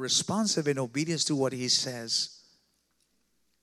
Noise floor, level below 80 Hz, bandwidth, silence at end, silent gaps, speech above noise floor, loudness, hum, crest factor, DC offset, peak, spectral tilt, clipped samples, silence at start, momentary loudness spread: -73 dBFS; -80 dBFS; 15 kHz; 1.3 s; none; 44 dB; -28 LUFS; none; 20 dB; under 0.1%; -12 dBFS; -3 dB/octave; under 0.1%; 0 s; 5 LU